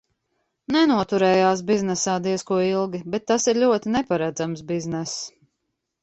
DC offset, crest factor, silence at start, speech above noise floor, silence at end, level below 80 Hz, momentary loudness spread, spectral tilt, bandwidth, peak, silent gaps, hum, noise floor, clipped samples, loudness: under 0.1%; 16 dB; 0.7 s; 57 dB; 0.75 s; -58 dBFS; 10 LU; -4.5 dB/octave; 8.2 kHz; -6 dBFS; none; none; -78 dBFS; under 0.1%; -22 LUFS